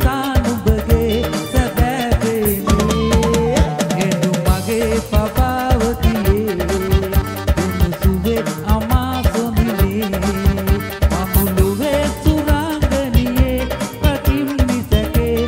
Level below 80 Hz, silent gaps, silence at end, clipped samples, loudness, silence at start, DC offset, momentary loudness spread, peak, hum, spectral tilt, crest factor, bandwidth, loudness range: -20 dBFS; none; 0 s; under 0.1%; -17 LUFS; 0 s; under 0.1%; 3 LU; 0 dBFS; none; -6 dB/octave; 16 dB; 16.5 kHz; 1 LU